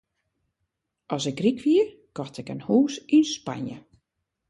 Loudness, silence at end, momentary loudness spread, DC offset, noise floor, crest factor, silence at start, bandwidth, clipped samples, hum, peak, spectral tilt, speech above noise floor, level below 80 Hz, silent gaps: -24 LUFS; 0.7 s; 15 LU; under 0.1%; -80 dBFS; 16 dB; 1.1 s; 11 kHz; under 0.1%; none; -10 dBFS; -5.5 dB/octave; 57 dB; -68 dBFS; none